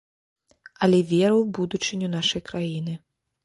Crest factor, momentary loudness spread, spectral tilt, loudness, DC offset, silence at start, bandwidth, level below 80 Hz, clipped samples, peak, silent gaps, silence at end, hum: 16 dB; 11 LU; -5.5 dB/octave; -23 LUFS; under 0.1%; 0.8 s; 11.5 kHz; -60 dBFS; under 0.1%; -8 dBFS; none; 0.5 s; none